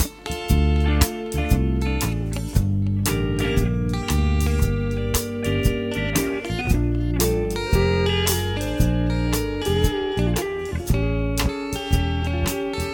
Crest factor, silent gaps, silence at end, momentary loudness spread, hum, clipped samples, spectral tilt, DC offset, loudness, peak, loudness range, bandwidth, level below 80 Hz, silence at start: 20 dB; none; 0 s; 5 LU; none; under 0.1%; -5.5 dB/octave; under 0.1%; -23 LUFS; -2 dBFS; 1 LU; 17.5 kHz; -26 dBFS; 0 s